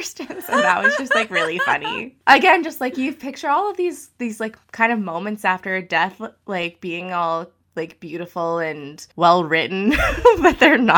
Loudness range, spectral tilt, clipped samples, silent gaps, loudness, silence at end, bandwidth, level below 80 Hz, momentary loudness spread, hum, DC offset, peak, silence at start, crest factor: 6 LU; -4.5 dB/octave; under 0.1%; none; -18 LUFS; 0 s; over 20 kHz; -42 dBFS; 16 LU; none; under 0.1%; 0 dBFS; 0 s; 18 dB